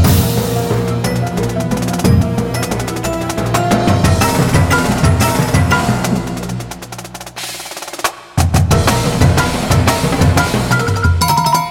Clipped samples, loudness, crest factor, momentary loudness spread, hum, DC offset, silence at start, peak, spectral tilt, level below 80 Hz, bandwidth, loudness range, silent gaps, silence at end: under 0.1%; -14 LUFS; 14 dB; 11 LU; 60 Hz at -35 dBFS; under 0.1%; 0 s; 0 dBFS; -5 dB/octave; -26 dBFS; 17 kHz; 4 LU; none; 0 s